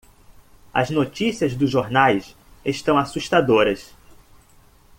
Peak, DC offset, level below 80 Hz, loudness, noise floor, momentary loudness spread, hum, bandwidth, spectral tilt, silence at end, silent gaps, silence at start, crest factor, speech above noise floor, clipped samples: -2 dBFS; under 0.1%; -52 dBFS; -20 LUFS; -52 dBFS; 9 LU; none; 16.5 kHz; -5.5 dB/octave; 1.15 s; none; 0.75 s; 20 dB; 33 dB; under 0.1%